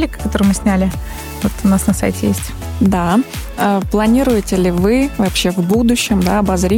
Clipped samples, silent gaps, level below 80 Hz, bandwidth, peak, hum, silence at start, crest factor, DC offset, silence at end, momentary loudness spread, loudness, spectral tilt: under 0.1%; none; -28 dBFS; 17.5 kHz; -2 dBFS; none; 0 s; 12 dB; under 0.1%; 0 s; 7 LU; -15 LUFS; -5.5 dB/octave